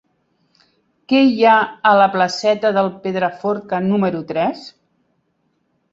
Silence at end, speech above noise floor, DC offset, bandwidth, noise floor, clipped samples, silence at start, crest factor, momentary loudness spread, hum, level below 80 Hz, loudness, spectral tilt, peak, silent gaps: 1.25 s; 50 dB; under 0.1%; 7.8 kHz; -66 dBFS; under 0.1%; 1.1 s; 16 dB; 8 LU; none; -62 dBFS; -16 LUFS; -6 dB/octave; -2 dBFS; none